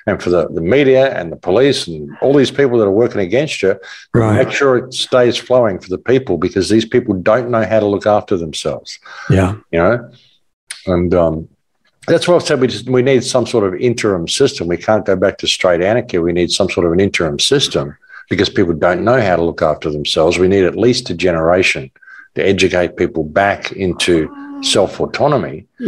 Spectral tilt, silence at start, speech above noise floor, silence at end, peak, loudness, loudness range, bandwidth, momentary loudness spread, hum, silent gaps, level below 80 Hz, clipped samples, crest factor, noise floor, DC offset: -5 dB/octave; 0.05 s; 47 dB; 0 s; 0 dBFS; -14 LUFS; 3 LU; 12.5 kHz; 7 LU; none; 10.53-10.67 s; -46 dBFS; under 0.1%; 14 dB; -61 dBFS; under 0.1%